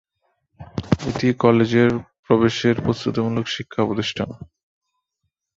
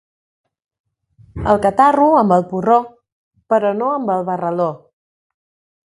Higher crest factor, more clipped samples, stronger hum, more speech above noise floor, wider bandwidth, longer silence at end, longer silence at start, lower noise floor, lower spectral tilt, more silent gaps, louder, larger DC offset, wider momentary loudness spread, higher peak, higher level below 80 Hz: about the same, 20 dB vs 18 dB; neither; neither; first, 58 dB vs 36 dB; second, 7.6 kHz vs 11.5 kHz; about the same, 1.1 s vs 1.2 s; second, 0.6 s vs 1.35 s; first, -77 dBFS vs -50 dBFS; second, -6.5 dB/octave vs -8 dB/octave; second, 2.19-2.23 s vs 3.12-3.31 s; second, -20 LUFS vs -16 LUFS; neither; first, 13 LU vs 10 LU; about the same, -2 dBFS vs 0 dBFS; about the same, -48 dBFS vs -44 dBFS